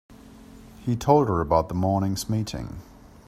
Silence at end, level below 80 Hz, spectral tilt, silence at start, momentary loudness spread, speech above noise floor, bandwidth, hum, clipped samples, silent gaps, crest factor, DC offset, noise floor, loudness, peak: 0.45 s; -46 dBFS; -7 dB/octave; 0.1 s; 15 LU; 23 dB; 15.5 kHz; none; under 0.1%; none; 22 dB; under 0.1%; -46 dBFS; -24 LUFS; -4 dBFS